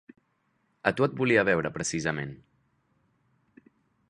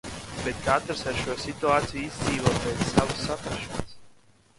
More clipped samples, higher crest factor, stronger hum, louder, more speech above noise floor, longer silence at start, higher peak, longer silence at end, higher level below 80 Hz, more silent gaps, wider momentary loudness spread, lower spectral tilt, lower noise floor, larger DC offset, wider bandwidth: neither; about the same, 26 dB vs 24 dB; neither; about the same, -27 LUFS vs -27 LUFS; first, 46 dB vs 30 dB; first, 0.85 s vs 0.05 s; about the same, -6 dBFS vs -4 dBFS; first, 1.75 s vs 0.45 s; second, -60 dBFS vs -44 dBFS; neither; about the same, 10 LU vs 9 LU; about the same, -5 dB/octave vs -4.5 dB/octave; first, -73 dBFS vs -57 dBFS; neither; about the same, 11.5 kHz vs 11.5 kHz